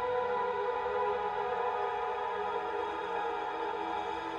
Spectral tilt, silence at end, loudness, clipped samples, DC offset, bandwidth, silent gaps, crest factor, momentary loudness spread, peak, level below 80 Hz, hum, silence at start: -4.5 dB/octave; 0 s; -34 LUFS; under 0.1%; under 0.1%; 8.8 kHz; none; 12 dB; 3 LU; -20 dBFS; -64 dBFS; none; 0 s